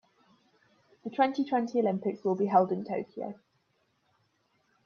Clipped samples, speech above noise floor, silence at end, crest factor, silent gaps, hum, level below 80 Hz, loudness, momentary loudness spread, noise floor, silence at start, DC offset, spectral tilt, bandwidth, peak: under 0.1%; 45 dB; 1.5 s; 22 dB; none; none; -82 dBFS; -29 LUFS; 14 LU; -74 dBFS; 1.05 s; under 0.1%; -7.5 dB/octave; 7 kHz; -10 dBFS